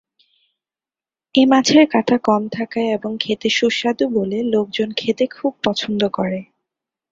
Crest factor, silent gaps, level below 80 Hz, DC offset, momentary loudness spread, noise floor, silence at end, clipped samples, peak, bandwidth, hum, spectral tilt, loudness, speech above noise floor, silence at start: 18 dB; none; -60 dBFS; under 0.1%; 9 LU; under -90 dBFS; 0.7 s; under 0.1%; -2 dBFS; 7.8 kHz; none; -4.5 dB/octave; -18 LUFS; over 73 dB; 1.35 s